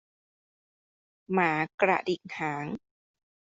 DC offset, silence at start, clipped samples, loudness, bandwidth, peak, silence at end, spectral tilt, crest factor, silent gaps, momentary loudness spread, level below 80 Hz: under 0.1%; 1.3 s; under 0.1%; -29 LUFS; 7.8 kHz; -8 dBFS; 0.7 s; -6.5 dB/octave; 24 dB; 1.74-1.78 s; 11 LU; -72 dBFS